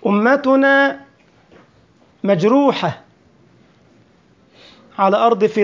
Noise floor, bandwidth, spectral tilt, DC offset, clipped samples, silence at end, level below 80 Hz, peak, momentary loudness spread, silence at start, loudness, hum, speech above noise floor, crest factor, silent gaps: -53 dBFS; 7.6 kHz; -6.5 dB/octave; under 0.1%; under 0.1%; 0 s; -64 dBFS; -2 dBFS; 15 LU; 0 s; -15 LUFS; none; 39 dB; 16 dB; none